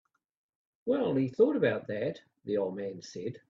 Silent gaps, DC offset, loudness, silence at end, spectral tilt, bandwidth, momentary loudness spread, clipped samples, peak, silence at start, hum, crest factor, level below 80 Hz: none; under 0.1%; -31 LUFS; 0.1 s; -7 dB/octave; 7.4 kHz; 14 LU; under 0.1%; -12 dBFS; 0.85 s; none; 20 dB; -74 dBFS